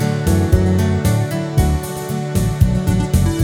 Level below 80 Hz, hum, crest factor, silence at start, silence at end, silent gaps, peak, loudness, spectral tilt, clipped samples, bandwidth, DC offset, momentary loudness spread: -24 dBFS; none; 14 dB; 0 s; 0 s; none; 0 dBFS; -17 LUFS; -6.5 dB/octave; under 0.1%; 17.5 kHz; under 0.1%; 6 LU